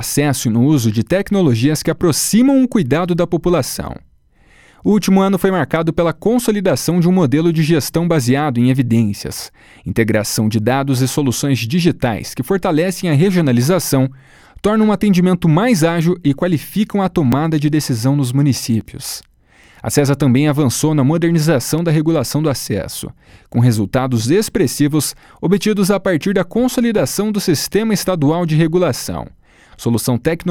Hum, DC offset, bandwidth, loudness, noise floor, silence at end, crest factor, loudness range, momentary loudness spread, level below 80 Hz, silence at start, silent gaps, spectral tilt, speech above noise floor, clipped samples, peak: none; under 0.1%; 18.5 kHz; -15 LUFS; -50 dBFS; 0 s; 14 dB; 2 LU; 8 LU; -42 dBFS; 0 s; none; -6 dB/octave; 35 dB; under 0.1%; 0 dBFS